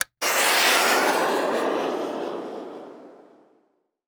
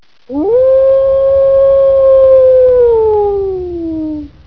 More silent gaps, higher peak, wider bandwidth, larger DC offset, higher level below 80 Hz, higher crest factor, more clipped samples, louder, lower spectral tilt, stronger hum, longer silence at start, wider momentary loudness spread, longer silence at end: neither; second, -6 dBFS vs 0 dBFS; first, over 20 kHz vs 3.9 kHz; second, under 0.1% vs 0.4%; second, -76 dBFS vs -36 dBFS; first, 18 dB vs 8 dB; neither; second, -21 LUFS vs -9 LUFS; second, -0.5 dB/octave vs -10 dB/octave; neither; second, 0 s vs 0.3 s; first, 19 LU vs 13 LU; first, 0.95 s vs 0.2 s